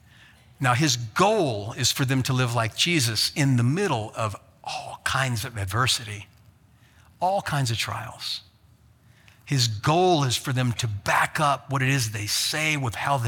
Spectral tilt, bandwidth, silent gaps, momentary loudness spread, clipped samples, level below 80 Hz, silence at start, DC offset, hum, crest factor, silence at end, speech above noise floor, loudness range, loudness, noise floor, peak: -4 dB/octave; 18.5 kHz; none; 10 LU; under 0.1%; -56 dBFS; 0.6 s; under 0.1%; none; 20 dB; 0 s; 32 dB; 6 LU; -24 LUFS; -56 dBFS; -6 dBFS